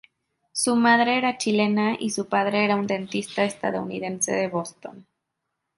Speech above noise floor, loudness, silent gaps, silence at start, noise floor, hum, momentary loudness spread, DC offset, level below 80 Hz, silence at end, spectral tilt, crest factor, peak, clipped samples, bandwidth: 57 dB; -23 LUFS; none; 0.55 s; -80 dBFS; none; 12 LU; under 0.1%; -68 dBFS; 0.75 s; -4 dB/octave; 18 dB; -6 dBFS; under 0.1%; 11.5 kHz